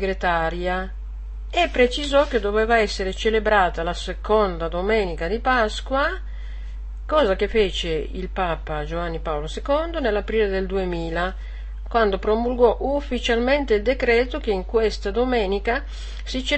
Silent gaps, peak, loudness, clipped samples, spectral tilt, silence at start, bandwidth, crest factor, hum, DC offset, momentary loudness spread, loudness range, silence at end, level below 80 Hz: none; -4 dBFS; -22 LUFS; under 0.1%; -5 dB/octave; 0 s; 8.8 kHz; 18 dB; none; 0.4%; 11 LU; 4 LU; 0 s; -30 dBFS